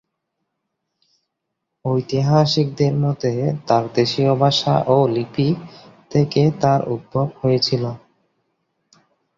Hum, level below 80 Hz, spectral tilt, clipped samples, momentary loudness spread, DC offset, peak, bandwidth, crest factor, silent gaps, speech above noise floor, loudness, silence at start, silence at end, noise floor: none; -54 dBFS; -7 dB/octave; under 0.1%; 8 LU; under 0.1%; -2 dBFS; 7.4 kHz; 18 dB; none; 60 dB; -19 LUFS; 1.85 s; 1.4 s; -78 dBFS